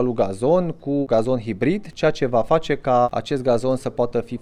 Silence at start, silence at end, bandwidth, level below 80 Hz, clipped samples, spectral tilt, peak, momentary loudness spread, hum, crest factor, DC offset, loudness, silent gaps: 0 s; 0.05 s; 11.5 kHz; -44 dBFS; under 0.1%; -7 dB/octave; -4 dBFS; 5 LU; none; 16 dB; under 0.1%; -21 LUFS; none